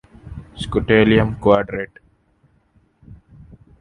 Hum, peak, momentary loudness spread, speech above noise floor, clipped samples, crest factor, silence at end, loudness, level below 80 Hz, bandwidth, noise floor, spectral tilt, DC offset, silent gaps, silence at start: none; 0 dBFS; 24 LU; 43 dB; under 0.1%; 20 dB; 0.65 s; -17 LUFS; -38 dBFS; 10.5 kHz; -59 dBFS; -7.5 dB/octave; under 0.1%; none; 0.25 s